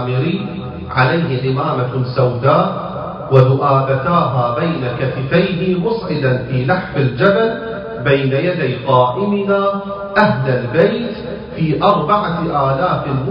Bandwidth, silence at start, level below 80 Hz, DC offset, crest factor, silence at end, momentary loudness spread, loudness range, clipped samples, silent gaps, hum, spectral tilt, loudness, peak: 5.4 kHz; 0 s; -42 dBFS; under 0.1%; 16 dB; 0 s; 8 LU; 1 LU; under 0.1%; none; none; -10 dB/octave; -16 LUFS; 0 dBFS